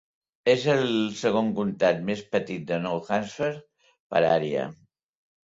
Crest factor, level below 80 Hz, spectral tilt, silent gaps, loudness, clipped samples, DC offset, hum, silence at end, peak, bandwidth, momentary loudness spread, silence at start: 20 dB; -66 dBFS; -5.5 dB/octave; 4.00-4.10 s; -26 LUFS; under 0.1%; under 0.1%; none; 0.8 s; -8 dBFS; 7.8 kHz; 8 LU; 0.45 s